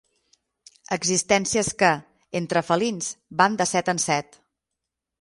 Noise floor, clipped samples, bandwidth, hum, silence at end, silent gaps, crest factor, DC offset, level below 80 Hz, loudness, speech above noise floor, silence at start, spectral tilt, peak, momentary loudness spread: -84 dBFS; under 0.1%; 11.5 kHz; none; 1 s; none; 22 dB; under 0.1%; -60 dBFS; -23 LUFS; 61 dB; 0.9 s; -3 dB/octave; -4 dBFS; 10 LU